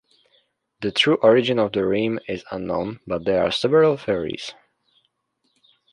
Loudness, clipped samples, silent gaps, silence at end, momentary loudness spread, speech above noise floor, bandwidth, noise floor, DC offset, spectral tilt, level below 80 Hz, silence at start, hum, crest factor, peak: -21 LUFS; under 0.1%; none; 1.4 s; 13 LU; 51 dB; 10.5 kHz; -72 dBFS; under 0.1%; -5.5 dB/octave; -54 dBFS; 0.8 s; none; 18 dB; -4 dBFS